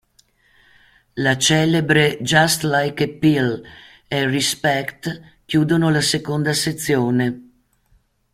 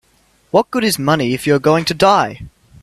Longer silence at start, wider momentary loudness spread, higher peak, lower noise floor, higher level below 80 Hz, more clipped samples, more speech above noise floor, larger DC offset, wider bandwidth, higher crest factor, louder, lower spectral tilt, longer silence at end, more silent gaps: first, 1.15 s vs 0.55 s; first, 12 LU vs 5 LU; about the same, 0 dBFS vs 0 dBFS; first, -60 dBFS vs -56 dBFS; second, -54 dBFS vs -48 dBFS; neither; about the same, 41 dB vs 41 dB; neither; first, 16 kHz vs 14.5 kHz; about the same, 18 dB vs 16 dB; second, -18 LUFS vs -15 LUFS; about the same, -4.5 dB/octave vs -5 dB/octave; first, 0.9 s vs 0.35 s; neither